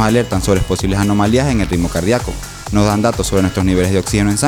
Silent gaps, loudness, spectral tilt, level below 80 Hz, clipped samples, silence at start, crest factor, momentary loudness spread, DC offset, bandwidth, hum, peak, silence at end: none; -15 LUFS; -5.5 dB/octave; -28 dBFS; under 0.1%; 0 s; 12 dB; 4 LU; under 0.1%; 19.5 kHz; none; -2 dBFS; 0 s